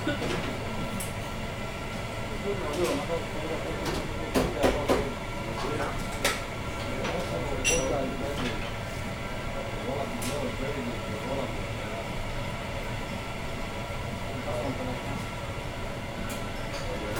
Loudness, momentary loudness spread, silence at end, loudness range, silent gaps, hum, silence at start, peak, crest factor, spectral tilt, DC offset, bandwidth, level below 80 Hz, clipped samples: -32 LUFS; 7 LU; 0 s; 5 LU; none; none; 0 s; -10 dBFS; 20 dB; -4.5 dB/octave; under 0.1%; over 20 kHz; -40 dBFS; under 0.1%